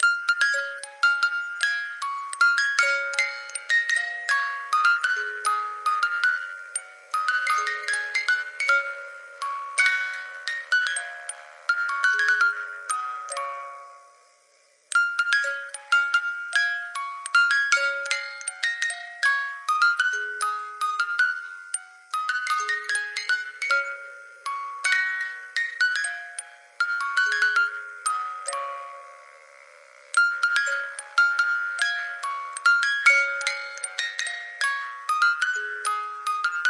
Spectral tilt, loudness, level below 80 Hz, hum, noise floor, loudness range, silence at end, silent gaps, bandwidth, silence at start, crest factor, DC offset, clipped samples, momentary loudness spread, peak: 6.5 dB/octave; -24 LUFS; under -90 dBFS; none; -61 dBFS; 4 LU; 0 s; none; 11.5 kHz; 0 s; 20 dB; under 0.1%; under 0.1%; 12 LU; -6 dBFS